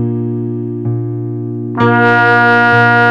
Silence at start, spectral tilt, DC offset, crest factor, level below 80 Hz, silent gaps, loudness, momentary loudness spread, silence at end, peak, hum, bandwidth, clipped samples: 0 s; -8 dB/octave; under 0.1%; 12 dB; -54 dBFS; none; -11 LUFS; 12 LU; 0 s; 0 dBFS; none; 6.8 kHz; under 0.1%